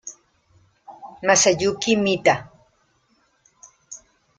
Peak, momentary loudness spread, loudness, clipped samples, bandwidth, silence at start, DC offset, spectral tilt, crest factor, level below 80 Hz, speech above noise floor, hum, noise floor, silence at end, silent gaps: -2 dBFS; 25 LU; -19 LUFS; under 0.1%; 10 kHz; 0.05 s; under 0.1%; -2.5 dB/octave; 22 dB; -60 dBFS; 45 dB; none; -64 dBFS; 0.4 s; none